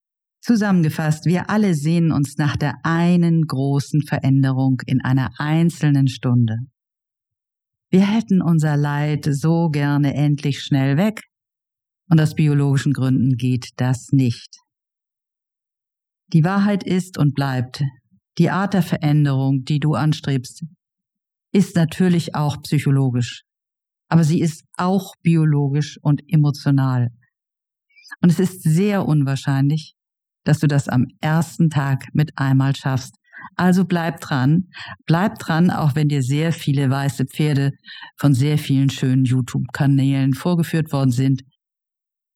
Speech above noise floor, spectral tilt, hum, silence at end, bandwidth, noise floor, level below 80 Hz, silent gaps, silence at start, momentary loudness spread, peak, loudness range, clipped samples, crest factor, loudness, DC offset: 69 dB; -7 dB/octave; none; 0.95 s; 14.5 kHz; -87 dBFS; -58 dBFS; none; 0.45 s; 6 LU; -2 dBFS; 2 LU; under 0.1%; 18 dB; -19 LUFS; under 0.1%